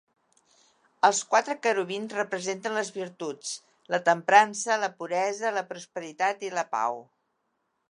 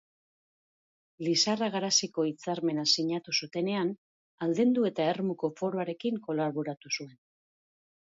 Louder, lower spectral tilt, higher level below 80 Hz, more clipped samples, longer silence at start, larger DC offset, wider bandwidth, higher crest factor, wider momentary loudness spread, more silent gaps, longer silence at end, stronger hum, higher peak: first, -27 LUFS vs -30 LUFS; about the same, -2.5 dB/octave vs -3.5 dB/octave; second, -86 dBFS vs -78 dBFS; neither; second, 1.05 s vs 1.2 s; neither; first, 11 kHz vs 7.8 kHz; about the same, 24 dB vs 20 dB; first, 15 LU vs 9 LU; second, none vs 3.98-4.38 s; second, 0.9 s vs 1.1 s; neither; first, -4 dBFS vs -12 dBFS